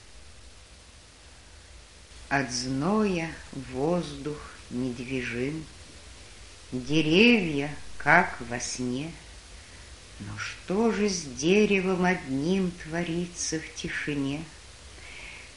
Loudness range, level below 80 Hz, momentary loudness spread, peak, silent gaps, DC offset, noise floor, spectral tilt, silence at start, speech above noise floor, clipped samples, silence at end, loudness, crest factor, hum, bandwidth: 7 LU; -52 dBFS; 25 LU; -4 dBFS; none; 0.2%; -51 dBFS; -4.5 dB/octave; 0.1 s; 24 dB; under 0.1%; 0 s; -27 LUFS; 26 dB; none; 11.5 kHz